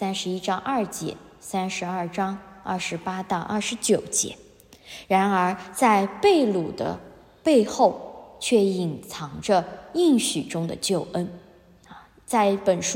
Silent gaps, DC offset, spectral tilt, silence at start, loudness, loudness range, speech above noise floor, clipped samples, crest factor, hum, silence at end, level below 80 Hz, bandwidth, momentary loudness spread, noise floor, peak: none; under 0.1%; -4 dB/octave; 0 s; -24 LUFS; 5 LU; 28 dB; under 0.1%; 20 dB; none; 0 s; -60 dBFS; 16 kHz; 14 LU; -52 dBFS; -4 dBFS